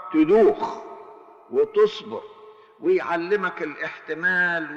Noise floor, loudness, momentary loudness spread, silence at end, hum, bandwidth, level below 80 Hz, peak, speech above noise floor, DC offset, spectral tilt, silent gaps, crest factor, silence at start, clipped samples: -46 dBFS; -22 LUFS; 18 LU; 0 s; none; 7.2 kHz; -62 dBFS; -8 dBFS; 24 dB; under 0.1%; -6.5 dB/octave; none; 16 dB; 0 s; under 0.1%